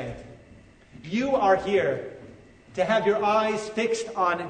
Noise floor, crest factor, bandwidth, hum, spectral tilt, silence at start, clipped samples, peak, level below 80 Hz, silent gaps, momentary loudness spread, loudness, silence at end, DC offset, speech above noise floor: -52 dBFS; 16 dB; 9.6 kHz; none; -5 dB/octave; 0 s; under 0.1%; -10 dBFS; -56 dBFS; none; 18 LU; -24 LUFS; 0 s; under 0.1%; 28 dB